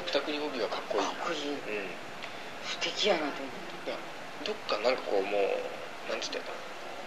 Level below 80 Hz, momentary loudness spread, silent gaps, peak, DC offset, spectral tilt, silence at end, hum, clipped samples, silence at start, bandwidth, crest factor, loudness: -74 dBFS; 12 LU; none; -12 dBFS; 0.5%; -2.5 dB/octave; 0 s; none; under 0.1%; 0 s; 14 kHz; 22 dB; -33 LUFS